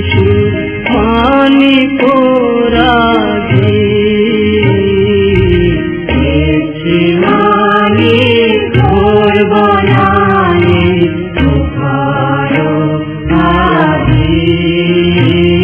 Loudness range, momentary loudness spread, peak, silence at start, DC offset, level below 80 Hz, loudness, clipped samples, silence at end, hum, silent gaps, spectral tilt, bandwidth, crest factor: 3 LU; 5 LU; 0 dBFS; 0 s; under 0.1%; -24 dBFS; -9 LUFS; 0.7%; 0 s; none; none; -11 dB/octave; 4 kHz; 8 dB